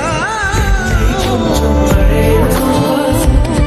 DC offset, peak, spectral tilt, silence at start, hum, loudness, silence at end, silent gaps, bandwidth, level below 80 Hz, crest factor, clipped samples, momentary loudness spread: under 0.1%; 0 dBFS; -5.5 dB/octave; 0 s; none; -12 LUFS; 0 s; none; 15 kHz; -16 dBFS; 10 dB; under 0.1%; 3 LU